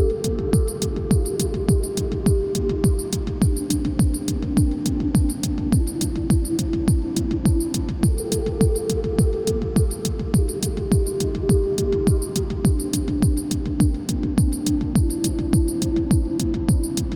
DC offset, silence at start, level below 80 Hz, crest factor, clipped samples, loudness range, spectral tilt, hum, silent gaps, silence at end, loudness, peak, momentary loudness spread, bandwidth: under 0.1%; 0 s; -26 dBFS; 16 dB; under 0.1%; 0 LU; -6.5 dB/octave; none; none; 0 s; -22 LUFS; -6 dBFS; 4 LU; over 20 kHz